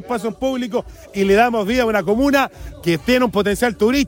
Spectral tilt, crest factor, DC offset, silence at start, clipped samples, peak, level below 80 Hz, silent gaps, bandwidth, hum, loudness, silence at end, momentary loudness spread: -5 dB/octave; 16 dB; under 0.1%; 0 s; under 0.1%; -2 dBFS; -40 dBFS; none; 18 kHz; none; -18 LUFS; 0 s; 9 LU